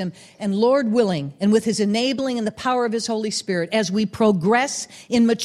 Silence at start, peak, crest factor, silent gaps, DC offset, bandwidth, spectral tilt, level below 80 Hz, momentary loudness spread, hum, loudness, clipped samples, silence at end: 0 s; -6 dBFS; 16 dB; none; under 0.1%; 13 kHz; -5 dB/octave; -60 dBFS; 6 LU; none; -21 LUFS; under 0.1%; 0 s